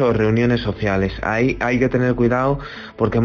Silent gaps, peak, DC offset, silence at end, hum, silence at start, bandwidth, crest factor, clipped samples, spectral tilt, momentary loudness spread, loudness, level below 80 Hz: none; -4 dBFS; under 0.1%; 0 s; none; 0 s; 7 kHz; 14 dB; under 0.1%; -6 dB/octave; 5 LU; -19 LUFS; -36 dBFS